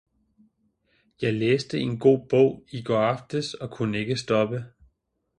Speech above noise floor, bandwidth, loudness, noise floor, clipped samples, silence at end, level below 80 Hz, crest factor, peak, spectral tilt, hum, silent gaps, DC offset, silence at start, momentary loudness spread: 48 dB; 10.5 kHz; -25 LUFS; -72 dBFS; under 0.1%; 0.7 s; -62 dBFS; 20 dB; -6 dBFS; -6.5 dB/octave; none; none; under 0.1%; 1.2 s; 10 LU